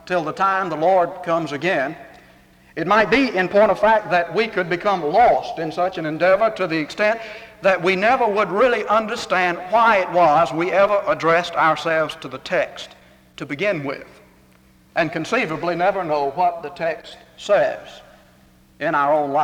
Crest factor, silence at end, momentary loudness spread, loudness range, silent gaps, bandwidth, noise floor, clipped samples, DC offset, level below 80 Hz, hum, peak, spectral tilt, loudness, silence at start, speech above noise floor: 16 dB; 0 s; 12 LU; 6 LU; none; 13.5 kHz; -53 dBFS; under 0.1%; under 0.1%; -54 dBFS; none; -4 dBFS; -5 dB/octave; -19 LUFS; 0.05 s; 34 dB